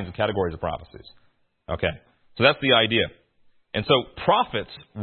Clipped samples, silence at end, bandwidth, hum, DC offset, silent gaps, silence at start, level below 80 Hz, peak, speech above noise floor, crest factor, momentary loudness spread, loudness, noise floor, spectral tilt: under 0.1%; 0 s; 4.4 kHz; none; under 0.1%; none; 0 s; -52 dBFS; -2 dBFS; 35 dB; 22 dB; 16 LU; -23 LUFS; -59 dBFS; -9.5 dB/octave